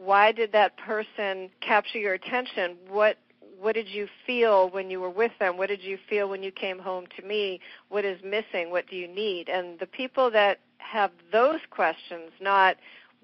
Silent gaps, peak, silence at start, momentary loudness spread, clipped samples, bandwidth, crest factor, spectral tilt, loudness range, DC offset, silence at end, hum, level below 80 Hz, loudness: none; -8 dBFS; 0 s; 12 LU; under 0.1%; 6 kHz; 20 dB; -0.5 dB/octave; 6 LU; under 0.1%; 0.35 s; none; -74 dBFS; -27 LUFS